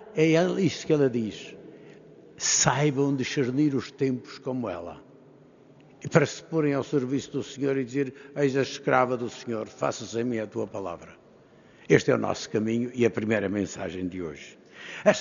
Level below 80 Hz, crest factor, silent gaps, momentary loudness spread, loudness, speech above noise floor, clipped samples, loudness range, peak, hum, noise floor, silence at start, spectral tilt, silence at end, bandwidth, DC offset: -64 dBFS; 26 dB; none; 14 LU; -26 LUFS; 28 dB; under 0.1%; 3 LU; -2 dBFS; none; -55 dBFS; 0 s; -5 dB/octave; 0 s; 7.4 kHz; under 0.1%